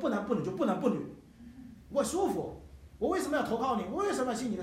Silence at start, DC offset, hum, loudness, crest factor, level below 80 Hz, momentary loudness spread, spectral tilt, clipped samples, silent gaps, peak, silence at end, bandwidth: 0 s; under 0.1%; none; -32 LUFS; 18 dB; -58 dBFS; 20 LU; -5.5 dB/octave; under 0.1%; none; -14 dBFS; 0 s; 16 kHz